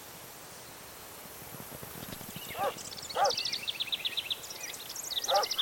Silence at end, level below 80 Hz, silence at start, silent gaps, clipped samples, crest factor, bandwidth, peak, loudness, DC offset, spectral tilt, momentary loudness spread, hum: 0 s; -66 dBFS; 0 s; none; under 0.1%; 20 dB; 17 kHz; -16 dBFS; -34 LUFS; under 0.1%; -1 dB/octave; 17 LU; none